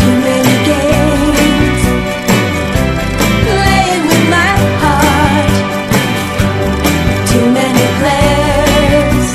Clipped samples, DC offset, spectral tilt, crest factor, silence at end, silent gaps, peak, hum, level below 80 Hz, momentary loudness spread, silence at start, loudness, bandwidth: 0.2%; under 0.1%; -5 dB/octave; 10 dB; 0 s; none; 0 dBFS; none; -22 dBFS; 4 LU; 0 s; -10 LUFS; 16 kHz